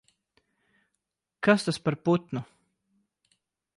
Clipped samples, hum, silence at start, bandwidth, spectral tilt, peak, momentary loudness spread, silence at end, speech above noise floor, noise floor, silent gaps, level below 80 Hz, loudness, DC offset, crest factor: under 0.1%; none; 1.4 s; 11.5 kHz; -6 dB/octave; -8 dBFS; 12 LU; 1.35 s; 58 dB; -83 dBFS; none; -70 dBFS; -27 LUFS; under 0.1%; 22 dB